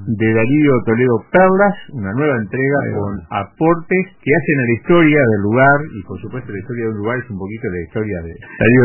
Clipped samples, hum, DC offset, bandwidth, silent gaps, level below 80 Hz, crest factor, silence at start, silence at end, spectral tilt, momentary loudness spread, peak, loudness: under 0.1%; none; under 0.1%; 3.1 kHz; none; -44 dBFS; 16 dB; 0 s; 0 s; -12 dB/octave; 15 LU; 0 dBFS; -15 LUFS